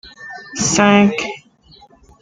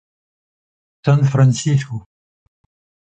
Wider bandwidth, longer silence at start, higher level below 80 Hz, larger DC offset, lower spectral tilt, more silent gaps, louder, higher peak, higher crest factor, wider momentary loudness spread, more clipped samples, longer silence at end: about the same, 9.4 kHz vs 8.8 kHz; second, 0.05 s vs 1.05 s; about the same, -50 dBFS vs -54 dBFS; neither; second, -4 dB/octave vs -6.5 dB/octave; neither; about the same, -14 LUFS vs -16 LUFS; about the same, 0 dBFS vs -2 dBFS; about the same, 18 dB vs 16 dB; first, 22 LU vs 15 LU; neither; second, 0.85 s vs 1.05 s